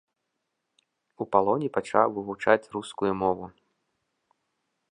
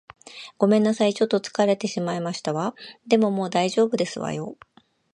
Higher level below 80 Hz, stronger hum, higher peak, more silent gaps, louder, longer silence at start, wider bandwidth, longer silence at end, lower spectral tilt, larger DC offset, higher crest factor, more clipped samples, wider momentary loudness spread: first, -64 dBFS vs -70 dBFS; neither; about the same, -4 dBFS vs -4 dBFS; neither; second, -26 LUFS vs -23 LUFS; first, 1.2 s vs 0.3 s; about the same, 10.5 kHz vs 11 kHz; first, 1.45 s vs 0.6 s; about the same, -6 dB/octave vs -5.5 dB/octave; neither; about the same, 24 dB vs 20 dB; neither; second, 12 LU vs 16 LU